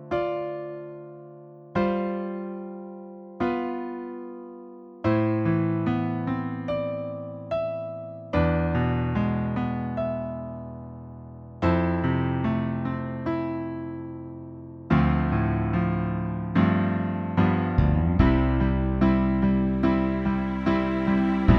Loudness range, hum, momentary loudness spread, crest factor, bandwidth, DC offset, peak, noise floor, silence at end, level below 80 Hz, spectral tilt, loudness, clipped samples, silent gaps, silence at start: 8 LU; none; 17 LU; 20 dB; 6 kHz; under 0.1%; -4 dBFS; -45 dBFS; 0 s; -36 dBFS; -10 dB/octave; -26 LUFS; under 0.1%; none; 0 s